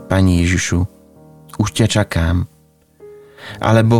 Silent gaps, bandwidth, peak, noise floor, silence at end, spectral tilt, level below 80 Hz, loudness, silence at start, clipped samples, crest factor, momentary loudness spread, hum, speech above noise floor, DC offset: none; 14.5 kHz; 0 dBFS; -50 dBFS; 0 s; -5.5 dB/octave; -38 dBFS; -17 LUFS; 0 s; under 0.1%; 16 dB; 17 LU; none; 36 dB; under 0.1%